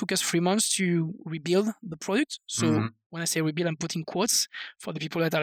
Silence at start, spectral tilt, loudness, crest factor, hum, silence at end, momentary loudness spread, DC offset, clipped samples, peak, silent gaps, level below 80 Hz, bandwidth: 0 s; -4 dB/octave; -27 LUFS; 16 dB; none; 0 s; 11 LU; under 0.1%; under 0.1%; -12 dBFS; 3.06-3.10 s; -72 dBFS; 18.5 kHz